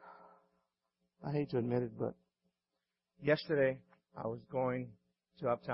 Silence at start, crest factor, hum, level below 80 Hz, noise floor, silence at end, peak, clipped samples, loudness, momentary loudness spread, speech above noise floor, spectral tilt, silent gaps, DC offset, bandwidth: 0 s; 20 dB; none; -74 dBFS; -89 dBFS; 0 s; -18 dBFS; under 0.1%; -37 LUFS; 15 LU; 54 dB; -6 dB/octave; none; under 0.1%; 5.6 kHz